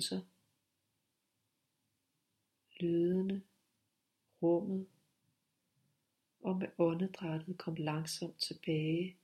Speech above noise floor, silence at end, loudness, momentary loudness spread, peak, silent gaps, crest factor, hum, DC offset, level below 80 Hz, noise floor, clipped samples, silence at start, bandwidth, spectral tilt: 48 dB; 0.1 s; -37 LUFS; 9 LU; -18 dBFS; none; 20 dB; none; under 0.1%; -80 dBFS; -84 dBFS; under 0.1%; 0 s; 13.5 kHz; -6 dB/octave